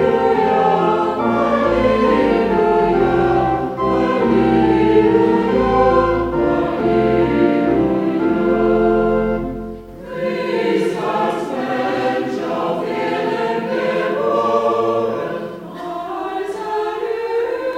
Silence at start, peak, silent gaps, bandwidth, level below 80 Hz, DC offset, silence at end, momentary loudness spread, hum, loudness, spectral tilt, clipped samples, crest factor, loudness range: 0 s; -2 dBFS; none; 10.5 kHz; -38 dBFS; under 0.1%; 0 s; 10 LU; none; -17 LUFS; -7.5 dB/octave; under 0.1%; 14 dB; 5 LU